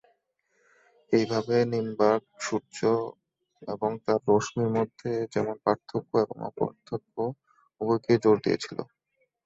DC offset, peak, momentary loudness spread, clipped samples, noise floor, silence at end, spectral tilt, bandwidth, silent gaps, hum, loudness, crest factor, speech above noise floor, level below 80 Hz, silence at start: under 0.1%; -8 dBFS; 11 LU; under 0.1%; -75 dBFS; 0.6 s; -6 dB/octave; 8 kHz; none; none; -28 LUFS; 20 dB; 48 dB; -66 dBFS; 1.1 s